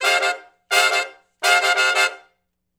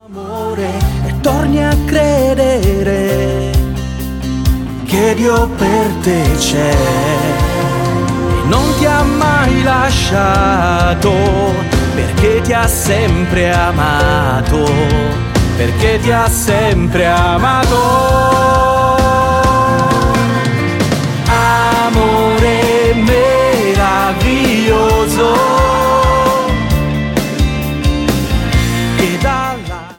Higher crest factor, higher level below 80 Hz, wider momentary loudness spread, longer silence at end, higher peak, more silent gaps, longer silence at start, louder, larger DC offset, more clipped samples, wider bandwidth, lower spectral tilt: first, 20 dB vs 12 dB; second, -78 dBFS vs -20 dBFS; first, 8 LU vs 5 LU; first, 0.6 s vs 0.05 s; about the same, 0 dBFS vs 0 dBFS; neither; about the same, 0 s vs 0.1 s; second, -18 LUFS vs -12 LUFS; neither; neither; first, over 20 kHz vs 17.5 kHz; second, 3 dB/octave vs -5.5 dB/octave